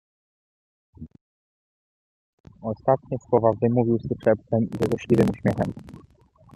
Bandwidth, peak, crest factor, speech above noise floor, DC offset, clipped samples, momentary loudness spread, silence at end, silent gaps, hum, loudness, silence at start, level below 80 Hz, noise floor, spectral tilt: 13 kHz; -4 dBFS; 20 dB; over 67 dB; under 0.1%; under 0.1%; 9 LU; 0.65 s; 1.21-2.44 s; none; -23 LUFS; 1 s; -54 dBFS; under -90 dBFS; -9 dB/octave